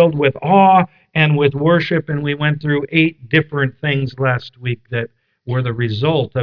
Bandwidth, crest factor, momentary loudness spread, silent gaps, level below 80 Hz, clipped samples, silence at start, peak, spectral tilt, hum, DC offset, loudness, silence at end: 5.4 kHz; 16 dB; 11 LU; none; -52 dBFS; under 0.1%; 0 s; 0 dBFS; -9 dB/octave; none; under 0.1%; -16 LUFS; 0 s